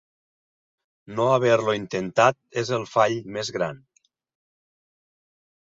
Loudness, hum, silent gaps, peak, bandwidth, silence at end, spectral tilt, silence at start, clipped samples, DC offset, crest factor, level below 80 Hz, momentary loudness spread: -23 LUFS; none; none; -4 dBFS; 7.8 kHz; 1.85 s; -5 dB/octave; 1.1 s; under 0.1%; under 0.1%; 22 dB; -66 dBFS; 10 LU